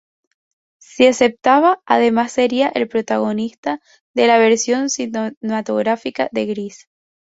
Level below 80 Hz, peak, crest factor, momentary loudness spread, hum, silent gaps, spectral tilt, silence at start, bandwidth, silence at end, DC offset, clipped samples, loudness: -62 dBFS; -2 dBFS; 16 dB; 11 LU; none; 3.58-3.63 s, 4.00-4.14 s, 5.37-5.41 s; -3.5 dB/octave; 0.95 s; 8 kHz; 0.6 s; under 0.1%; under 0.1%; -17 LUFS